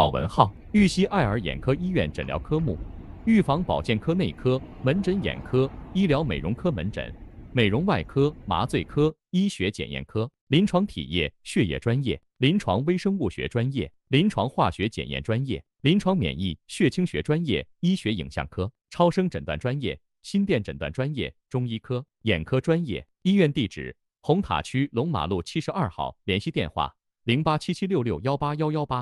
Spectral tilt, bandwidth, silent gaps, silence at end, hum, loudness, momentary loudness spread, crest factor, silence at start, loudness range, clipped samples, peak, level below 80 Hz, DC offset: -6.5 dB/octave; 12 kHz; 10.41-10.47 s; 0 s; none; -26 LUFS; 9 LU; 24 dB; 0 s; 2 LU; under 0.1%; -2 dBFS; -44 dBFS; under 0.1%